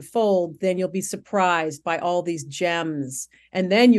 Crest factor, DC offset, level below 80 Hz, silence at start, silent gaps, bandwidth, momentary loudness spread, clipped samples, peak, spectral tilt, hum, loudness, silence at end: 18 dB; under 0.1%; -70 dBFS; 0 s; none; 12.5 kHz; 9 LU; under 0.1%; -4 dBFS; -4.5 dB/octave; none; -24 LUFS; 0 s